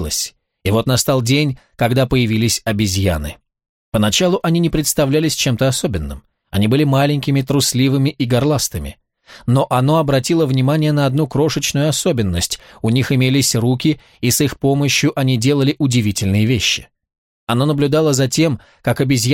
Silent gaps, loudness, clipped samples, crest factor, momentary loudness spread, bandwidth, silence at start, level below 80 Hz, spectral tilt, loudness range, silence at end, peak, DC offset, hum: 3.69-3.92 s, 17.18-17.47 s; -16 LUFS; under 0.1%; 14 dB; 7 LU; 17 kHz; 0 s; -38 dBFS; -5 dB/octave; 1 LU; 0 s; -2 dBFS; under 0.1%; none